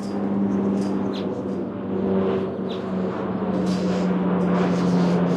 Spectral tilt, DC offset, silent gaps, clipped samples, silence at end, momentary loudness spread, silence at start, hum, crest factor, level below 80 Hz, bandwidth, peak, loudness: -8 dB/octave; under 0.1%; none; under 0.1%; 0 s; 7 LU; 0 s; none; 14 dB; -58 dBFS; 9 kHz; -8 dBFS; -23 LUFS